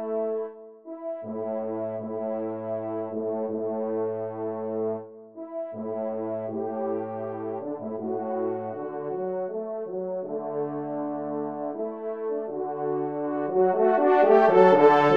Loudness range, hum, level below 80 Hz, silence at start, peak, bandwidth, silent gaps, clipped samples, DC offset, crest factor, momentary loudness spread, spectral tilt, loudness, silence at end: 8 LU; none; -76 dBFS; 0 s; -4 dBFS; 6.4 kHz; none; under 0.1%; under 0.1%; 22 dB; 14 LU; -8 dB/octave; -27 LUFS; 0 s